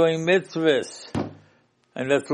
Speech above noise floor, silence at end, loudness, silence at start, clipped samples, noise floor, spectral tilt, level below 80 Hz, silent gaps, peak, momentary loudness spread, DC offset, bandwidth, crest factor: 39 dB; 0 s; -24 LUFS; 0 s; under 0.1%; -62 dBFS; -5 dB/octave; -62 dBFS; none; -6 dBFS; 13 LU; under 0.1%; 11 kHz; 16 dB